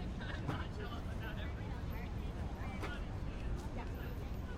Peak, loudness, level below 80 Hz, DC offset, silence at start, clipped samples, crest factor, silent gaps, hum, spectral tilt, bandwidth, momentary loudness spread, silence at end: -26 dBFS; -44 LUFS; -46 dBFS; under 0.1%; 0 s; under 0.1%; 14 dB; none; none; -6.5 dB/octave; 15 kHz; 3 LU; 0 s